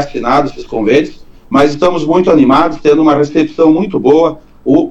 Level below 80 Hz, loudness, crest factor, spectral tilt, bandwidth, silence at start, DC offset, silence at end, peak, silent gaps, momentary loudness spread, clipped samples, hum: -38 dBFS; -10 LUFS; 10 dB; -7 dB/octave; 8 kHz; 0 s; under 0.1%; 0 s; 0 dBFS; none; 7 LU; under 0.1%; none